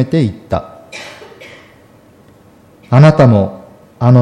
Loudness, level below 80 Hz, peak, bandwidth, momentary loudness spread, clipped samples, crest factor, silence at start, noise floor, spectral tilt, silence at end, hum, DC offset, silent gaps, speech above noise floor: -11 LUFS; -44 dBFS; 0 dBFS; 9.2 kHz; 25 LU; under 0.1%; 14 dB; 0 s; -44 dBFS; -8.5 dB/octave; 0 s; none; under 0.1%; none; 34 dB